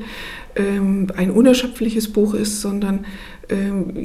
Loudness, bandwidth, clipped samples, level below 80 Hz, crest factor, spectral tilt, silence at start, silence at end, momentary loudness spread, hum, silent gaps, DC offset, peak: -19 LUFS; 16 kHz; under 0.1%; -40 dBFS; 18 dB; -5.5 dB/octave; 0 s; 0 s; 14 LU; none; none; under 0.1%; -2 dBFS